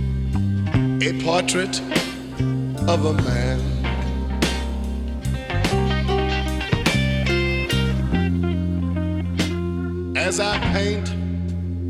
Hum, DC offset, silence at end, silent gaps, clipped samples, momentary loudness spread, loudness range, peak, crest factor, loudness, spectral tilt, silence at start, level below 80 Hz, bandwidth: none; 0.1%; 0 s; none; under 0.1%; 6 LU; 2 LU; -2 dBFS; 20 dB; -22 LUFS; -5.5 dB/octave; 0 s; -30 dBFS; 14.5 kHz